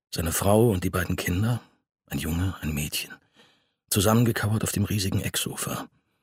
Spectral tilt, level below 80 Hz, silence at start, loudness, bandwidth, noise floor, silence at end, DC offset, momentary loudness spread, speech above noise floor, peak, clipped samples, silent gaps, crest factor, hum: -5 dB/octave; -44 dBFS; 0.1 s; -26 LUFS; 16 kHz; -63 dBFS; 0.35 s; under 0.1%; 11 LU; 38 dB; -6 dBFS; under 0.1%; none; 20 dB; none